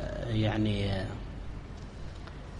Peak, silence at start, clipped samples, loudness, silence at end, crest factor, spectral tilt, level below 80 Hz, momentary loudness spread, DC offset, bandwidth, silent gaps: -18 dBFS; 0 s; under 0.1%; -33 LUFS; 0 s; 16 dB; -7 dB/octave; -42 dBFS; 15 LU; under 0.1%; 10 kHz; none